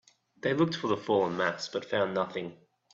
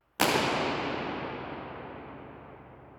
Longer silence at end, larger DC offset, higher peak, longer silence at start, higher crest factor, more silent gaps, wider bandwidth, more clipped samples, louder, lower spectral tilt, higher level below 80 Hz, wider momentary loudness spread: first, 0.4 s vs 0 s; neither; second, -12 dBFS vs -6 dBFS; first, 0.45 s vs 0.2 s; second, 18 dB vs 28 dB; neither; second, 7.8 kHz vs 19.5 kHz; neither; about the same, -30 LUFS vs -31 LUFS; first, -5.5 dB/octave vs -3.5 dB/octave; second, -72 dBFS vs -60 dBFS; second, 8 LU vs 22 LU